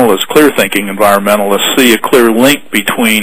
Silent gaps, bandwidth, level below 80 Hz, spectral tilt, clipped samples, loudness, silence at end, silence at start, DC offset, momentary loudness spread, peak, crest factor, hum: none; over 20 kHz; -46 dBFS; -3 dB/octave; 2%; -8 LUFS; 0 s; 0 s; 4%; 4 LU; 0 dBFS; 8 dB; none